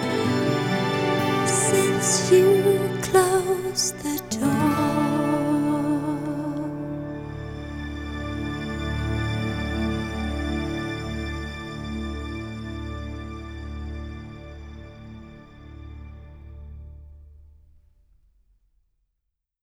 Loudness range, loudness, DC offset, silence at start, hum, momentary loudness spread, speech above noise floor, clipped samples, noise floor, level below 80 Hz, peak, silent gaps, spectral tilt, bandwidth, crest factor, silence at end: 22 LU; -24 LUFS; under 0.1%; 0 s; none; 22 LU; 60 dB; under 0.1%; -80 dBFS; -40 dBFS; -4 dBFS; none; -4.5 dB/octave; 17.5 kHz; 20 dB; 2.15 s